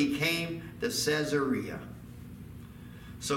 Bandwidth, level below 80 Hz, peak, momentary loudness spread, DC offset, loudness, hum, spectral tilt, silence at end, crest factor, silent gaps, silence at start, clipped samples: 17 kHz; -56 dBFS; -14 dBFS; 19 LU; under 0.1%; -31 LUFS; none; -4 dB/octave; 0 s; 18 dB; none; 0 s; under 0.1%